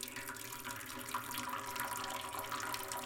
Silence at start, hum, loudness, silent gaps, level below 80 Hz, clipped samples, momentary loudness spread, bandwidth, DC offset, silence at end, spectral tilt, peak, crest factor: 0 s; none; -41 LUFS; none; -68 dBFS; under 0.1%; 4 LU; 17 kHz; under 0.1%; 0 s; -1.5 dB/octave; -20 dBFS; 22 dB